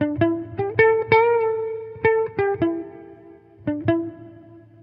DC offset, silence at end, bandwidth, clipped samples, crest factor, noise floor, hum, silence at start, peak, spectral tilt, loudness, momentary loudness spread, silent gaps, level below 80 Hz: under 0.1%; 0.25 s; 5.4 kHz; under 0.1%; 20 dB; -46 dBFS; none; 0 s; -2 dBFS; -10 dB/octave; -21 LUFS; 14 LU; none; -56 dBFS